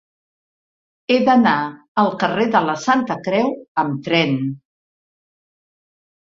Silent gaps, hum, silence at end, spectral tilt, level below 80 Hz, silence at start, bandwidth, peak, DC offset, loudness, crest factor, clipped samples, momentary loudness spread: 1.88-1.95 s, 3.68-3.75 s; none; 1.75 s; -6 dB/octave; -62 dBFS; 1.1 s; 7.6 kHz; -2 dBFS; under 0.1%; -18 LUFS; 18 dB; under 0.1%; 9 LU